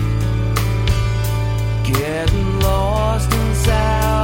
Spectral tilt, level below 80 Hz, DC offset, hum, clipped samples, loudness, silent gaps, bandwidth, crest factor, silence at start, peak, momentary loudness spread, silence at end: -5.5 dB/octave; -22 dBFS; under 0.1%; none; under 0.1%; -18 LUFS; none; 17 kHz; 14 dB; 0 s; -2 dBFS; 3 LU; 0 s